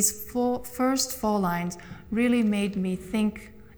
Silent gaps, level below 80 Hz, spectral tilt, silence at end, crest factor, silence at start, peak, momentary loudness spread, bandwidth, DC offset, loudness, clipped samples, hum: none; -52 dBFS; -4 dB/octave; 0 s; 18 dB; 0 s; -10 dBFS; 8 LU; over 20 kHz; under 0.1%; -26 LUFS; under 0.1%; none